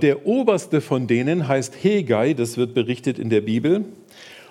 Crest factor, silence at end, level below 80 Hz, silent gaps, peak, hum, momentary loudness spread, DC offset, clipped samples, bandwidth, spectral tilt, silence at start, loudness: 18 dB; 0.1 s; -72 dBFS; none; -2 dBFS; none; 4 LU; under 0.1%; under 0.1%; 13.5 kHz; -6.5 dB/octave; 0 s; -21 LUFS